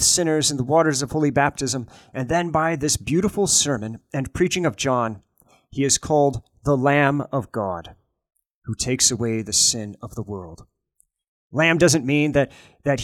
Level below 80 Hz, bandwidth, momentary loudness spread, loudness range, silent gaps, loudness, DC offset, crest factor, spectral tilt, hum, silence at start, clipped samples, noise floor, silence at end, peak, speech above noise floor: -48 dBFS; 17.5 kHz; 15 LU; 2 LU; 8.54-8.62 s, 11.28-11.50 s; -20 LUFS; under 0.1%; 18 dB; -3.5 dB/octave; none; 0 s; under 0.1%; -67 dBFS; 0 s; -4 dBFS; 46 dB